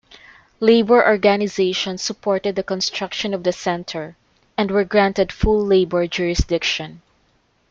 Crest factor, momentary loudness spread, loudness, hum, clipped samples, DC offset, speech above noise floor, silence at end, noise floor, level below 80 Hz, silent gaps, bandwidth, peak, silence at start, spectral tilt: 18 dB; 11 LU; -19 LUFS; none; under 0.1%; under 0.1%; 43 dB; 0.75 s; -62 dBFS; -36 dBFS; none; 7.6 kHz; -2 dBFS; 0.6 s; -4.5 dB/octave